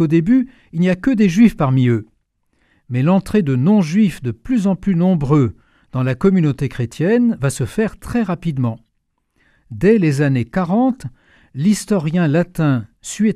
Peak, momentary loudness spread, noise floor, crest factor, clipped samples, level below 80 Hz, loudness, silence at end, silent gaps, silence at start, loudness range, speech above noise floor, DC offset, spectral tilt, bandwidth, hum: 0 dBFS; 9 LU; -68 dBFS; 16 dB; under 0.1%; -42 dBFS; -17 LUFS; 0 s; none; 0 s; 3 LU; 53 dB; under 0.1%; -7.5 dB/octave; 14 kHz; none